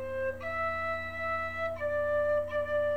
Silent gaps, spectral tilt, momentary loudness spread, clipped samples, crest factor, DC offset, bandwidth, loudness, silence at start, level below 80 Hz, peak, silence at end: none; -6 dB/octave; 5 LU; under 0.1%; 10 dB; 0.3%; 12.5 kHz; -32 LUFS; 0 s; -56 dBFS; -20 dBFS; 0 s